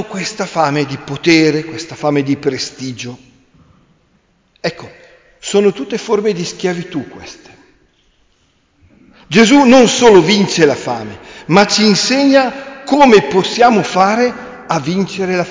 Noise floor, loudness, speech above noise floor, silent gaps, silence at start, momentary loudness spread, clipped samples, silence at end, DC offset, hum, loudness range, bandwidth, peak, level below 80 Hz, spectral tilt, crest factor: -57 dBFS; -12 LUFS; 45 dB; none; 0 s; 17 LU; under 0.1%; 0 s; under 0.1%; none; 11 LU; 7.6 kHz; 0 dBFS; -50 dBFS; -4.5 dB/octave; 14 dB